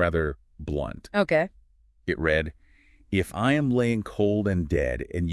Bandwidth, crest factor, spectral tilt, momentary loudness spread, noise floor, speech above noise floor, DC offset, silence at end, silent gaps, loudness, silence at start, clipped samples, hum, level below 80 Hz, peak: 12 kHz; 18 dB; -7 dB/octave; 9 LU; -59 dBFS; 34 dB; under 0.1%; 0 s; none; -26 LUFS; 0 s; under 0.1%; none; -42 dBFS; -8 dBFS